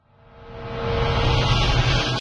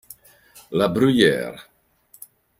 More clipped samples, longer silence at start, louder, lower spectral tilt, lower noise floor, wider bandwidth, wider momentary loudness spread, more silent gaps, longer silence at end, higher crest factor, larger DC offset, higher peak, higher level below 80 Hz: neither; second, 0.35 s vs 0.7 s; about the same, -21 LUFS vs -19 LUFS; about the same, -5 dB/octave vs -5.5 dB/octave; second, -46 dBFS vs -56 dBFS; second, 10.5 kHz vs 16 kHz; about the same, 16 LU vs 17 LU; neither; second, 0 s vs 1 s; second, 14 dB vs 20 dB; neither; second, -6 dBFS vs -2 dBFS; first, -28 dBFS vs -58 dBFS